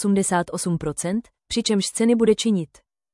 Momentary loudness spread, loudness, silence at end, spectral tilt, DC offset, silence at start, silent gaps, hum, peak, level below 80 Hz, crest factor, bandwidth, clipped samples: 9 LU; -22 LUFS; 0.5 s; -4.5 dB/octave; under 0.1%; 0 s; none; none; -6 dBFS; -52 dBFS; 16 dB; 12 kHz; under 0.1%